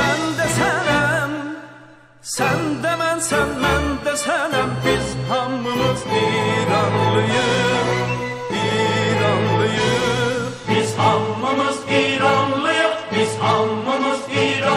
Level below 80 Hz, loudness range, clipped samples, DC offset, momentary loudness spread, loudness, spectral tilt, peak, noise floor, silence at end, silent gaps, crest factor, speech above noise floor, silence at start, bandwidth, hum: -42 dBFS; 2 LU; under 0.1%; under 0.1%; 5 LU; -19 LUFS; -4.5 dB/octave; -2 dBFS; -45 dBFS; 0 s; none; 16 dB; 26 dB; 0 s; 16 kHz; none